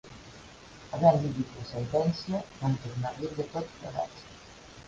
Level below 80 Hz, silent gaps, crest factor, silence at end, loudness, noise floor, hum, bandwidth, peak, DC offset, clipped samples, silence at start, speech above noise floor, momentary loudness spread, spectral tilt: -56 dBFS; none; 24 dB; 0 s; -31 LUFS; -50 dBFS; none; 9 kHz; -8 dBFS; under 0.1%; under 0.1%; 0.05 s; 20 dB; 25 LU; -7 dB/octave